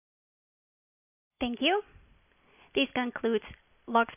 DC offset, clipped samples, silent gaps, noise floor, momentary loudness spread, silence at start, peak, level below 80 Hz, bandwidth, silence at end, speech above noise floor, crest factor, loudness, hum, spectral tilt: under 0.1%; under 0.1%; none; -63 dBFS; 8 LU; 1.4 s; -12 dBFS; -62 dBFS; 3.7 kHz; 0 s; 34 dB; 22 dB; -30 LUFS; none; -1 dB/octave